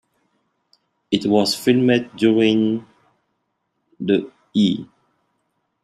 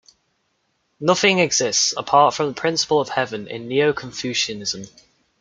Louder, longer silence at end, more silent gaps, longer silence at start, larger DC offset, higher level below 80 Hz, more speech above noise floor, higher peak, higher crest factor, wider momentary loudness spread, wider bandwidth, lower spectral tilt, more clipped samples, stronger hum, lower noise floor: about the same, -19 LUFS vs -19 LUFS; first, 1 s vs 0.55 s; neither; about the same, 1.1 s vs 1 s; neither; about the same, -64 dBFS vs -62 dBFS; first, 55 dB vs 49 dB; about the same, -2 dBFS vs -2 dBFS; about the same, 18 dB vs 20 dB; about the same, 9 LU vs 11 LU; first, 14.5 kHz vs 10.5 kHz; first, -5.5 dB/octave vs -2.5 dB/octave; neither; neither; first, -73 dBFS vs -69 dBFS